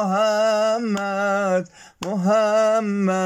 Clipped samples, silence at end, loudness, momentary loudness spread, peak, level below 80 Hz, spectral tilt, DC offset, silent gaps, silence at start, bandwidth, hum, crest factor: under 0.1%; 0 s; -20 LUFS; 8 LU; -8 dBFS; -66 dBFS; -5.5 dB/octave; under 0.1%; none; 0 s; 14.5 kHz; none; 12 dB